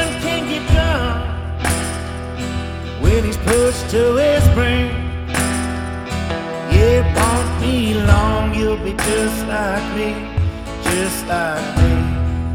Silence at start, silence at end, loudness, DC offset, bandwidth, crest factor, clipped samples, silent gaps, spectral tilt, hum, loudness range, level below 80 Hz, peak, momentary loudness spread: 0 s; 0 s; -18 LUFS; under 0.1%; 16.5 kHz; 16 dB; under 0.1%; none; -5.5 dB/octave; none; 3 LU; -24 dBFS; -2 dBFS; 10 LU